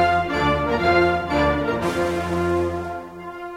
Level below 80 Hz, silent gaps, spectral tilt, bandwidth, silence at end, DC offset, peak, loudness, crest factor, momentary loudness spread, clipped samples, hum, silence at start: -38 dBFS; none; -6 dB/octave; 15.5 kHz; 0 s; under 0.1%; -6 dBFS; -21 LUFS; 16 dB; 13 LU; under 0.1%; none; 0 s